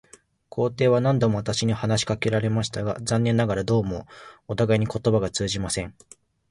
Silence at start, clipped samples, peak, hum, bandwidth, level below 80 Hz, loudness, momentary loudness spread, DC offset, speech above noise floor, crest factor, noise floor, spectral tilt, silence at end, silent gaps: 0.55 s; under 0.1%; -8 dBFS; none; 11.5 kHz; -48 dBFS; -24 LUFS; 11 LU; under 0.1%; 26 dB; 16 dB; -49 dBFS; -5.5 dB/octave; 0.6 s; none